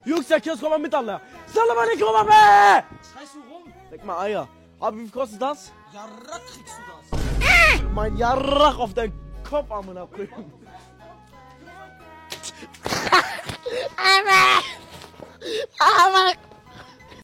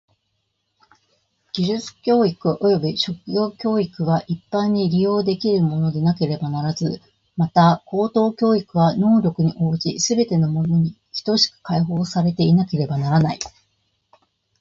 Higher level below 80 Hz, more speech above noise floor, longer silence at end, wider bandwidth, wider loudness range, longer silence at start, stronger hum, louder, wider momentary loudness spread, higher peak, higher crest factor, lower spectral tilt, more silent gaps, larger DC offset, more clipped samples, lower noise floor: first, -36 dBFS vs -54 dBFS; second, 27 dB vs 53 dB; second, 0.4 s vs 1.1 s; first, 16.5 kHz vs 7.8 kHz; first, 14 LU vs 3 LU; second, 0.05 s vs 1.55 s; neither; about the same, -18 LUFS vs -20 LUFS; first, 24 LU vs 7 LU; about the same, -4 dBFS vs -2 dBFS; about the same, 18 dB vs 18 dB; second, -3.5 dB/octave vs -6.5 dB/octave; neither; neither; neither; second, -47 dBFS vs -72 dBFS